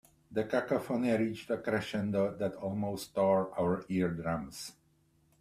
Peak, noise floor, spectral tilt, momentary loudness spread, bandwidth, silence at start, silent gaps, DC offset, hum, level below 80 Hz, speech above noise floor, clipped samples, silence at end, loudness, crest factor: -16 dBFS; -70 dBFS; -6.5 dB/octave; 8 LU; 15 kHz; 0.3 s; none; under 0.1%; none; -64 dBFS; 37 dB; under 0.1%; 0.7 s; -33 LUFS; 16 dB